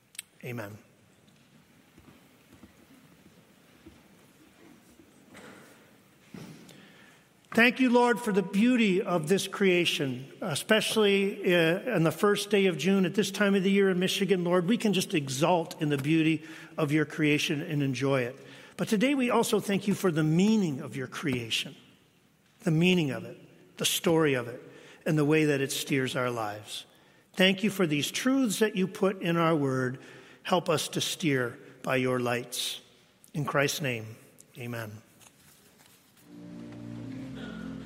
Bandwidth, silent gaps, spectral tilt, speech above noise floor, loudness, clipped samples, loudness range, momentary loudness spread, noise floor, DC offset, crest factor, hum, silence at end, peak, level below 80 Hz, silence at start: 16 kHz; none; -5 dB/octave; 37 dB; -27 LUFS; under 0.1%; 8 LU; 16 LU; -64 dBFS; under 0.1%; 22 dB; none; 0 s; -6 dBFS; -70 dBFS; 0.2 s